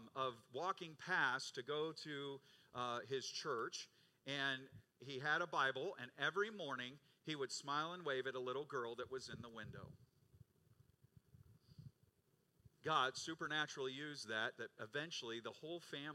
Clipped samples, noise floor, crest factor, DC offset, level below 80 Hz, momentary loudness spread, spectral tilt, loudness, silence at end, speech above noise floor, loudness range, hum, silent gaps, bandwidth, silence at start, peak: under 0.1%; -80 dBFS; 22 dB; under 0.1%; -84 dBFS; 15 LU; -3 dB/octave; -44 LUFS; 0 s; 35 dB; 9 LU; none; none; 15.5 kHz; 0 s; -24 dBFS